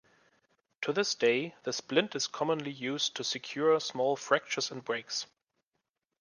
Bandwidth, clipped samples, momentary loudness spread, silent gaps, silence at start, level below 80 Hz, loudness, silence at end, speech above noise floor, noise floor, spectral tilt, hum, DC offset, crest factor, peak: 10 kHz; under 0.1%; 8 LU; none; 0.8 s; -82 dBFS; -31 LUFS; 0.95 s; 53 dB; -85 dBFS; -3 dB/octave; none; under 0.1%; 22 dB; -12 dBFS